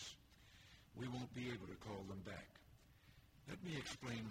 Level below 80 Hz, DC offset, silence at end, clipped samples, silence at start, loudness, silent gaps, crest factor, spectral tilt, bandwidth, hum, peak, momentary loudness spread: -70 dBFS; under 0.1%; 0 s; under 0.1%; 0 s; -51 LUFS; none; 16 dB; -5 dB/octave; 16 kHz; none; -36 dBFS; 20 LU